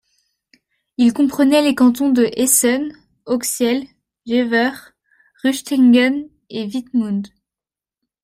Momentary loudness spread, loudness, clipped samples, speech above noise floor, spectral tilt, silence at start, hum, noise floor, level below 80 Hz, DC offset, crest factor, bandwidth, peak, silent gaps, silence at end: 13 LU; -17 LUFS; under 0.1%; 74 dB; -3 dB/octave; 1 s; none; -90 dBFS; -60 dBFS; under 0.1%; 18 dB; 16 kHz; 0 dBFS; none; 0.95 s